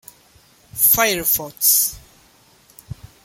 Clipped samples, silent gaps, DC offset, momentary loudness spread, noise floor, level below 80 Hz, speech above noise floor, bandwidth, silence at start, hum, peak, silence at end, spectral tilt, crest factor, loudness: under 0.1%; none; under 0.1%; 22 LU; -53 dBFS; -50 dBFS; 36 dB; 17 kHz; 0.75 s; none; 0 dBFS; 0.2 s; -1 dB/octave; 22 dB; -15 LUFS